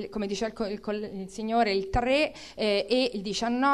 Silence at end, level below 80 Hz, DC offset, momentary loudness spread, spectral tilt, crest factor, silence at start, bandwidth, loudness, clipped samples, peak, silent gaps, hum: 0 s; -46 dBFS; 0.1%; 8 LU; -4.5 dB/octave; 16 dB; 0 s; 13 kHz; -28 LUFS; under 0.1%; -12 dBFS; none; none